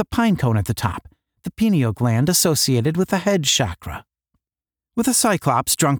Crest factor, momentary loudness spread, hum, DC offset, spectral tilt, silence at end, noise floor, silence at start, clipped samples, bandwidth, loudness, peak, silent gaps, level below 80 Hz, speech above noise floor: 16 dB; 17 LU; none; under 0.1%; -4.5 dB/octave; 0 s; under -90 dBFS; 0 s; under 0.1%; over 20 kHz; -19 LUFS; -4 dBFS; none; -44 dBFS; over 71 dB